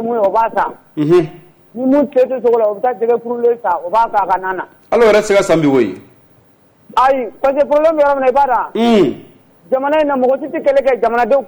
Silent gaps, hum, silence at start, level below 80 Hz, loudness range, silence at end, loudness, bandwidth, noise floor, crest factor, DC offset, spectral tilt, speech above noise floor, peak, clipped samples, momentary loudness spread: none; none; 0 s; -48 dBFS; 1 LU; 0 s; -14 LUFS; over 20 kHz; -50 dBFS; 10 dB; under 0.1%; -6 dB/octave; 37 dB; -4 dBFS; under 0.1%; 8 LU